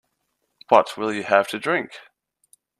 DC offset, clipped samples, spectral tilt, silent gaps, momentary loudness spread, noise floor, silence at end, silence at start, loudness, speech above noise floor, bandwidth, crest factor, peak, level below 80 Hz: under 0.1%; under 0.1%; -4.5 dB/octave; none; 8 LU; -74 dBFS; 0.8 s; 0.7 s; -21 LUFS; 54 dB; 14 kHz; 24 dB; 0 dBFS; -72 dBFS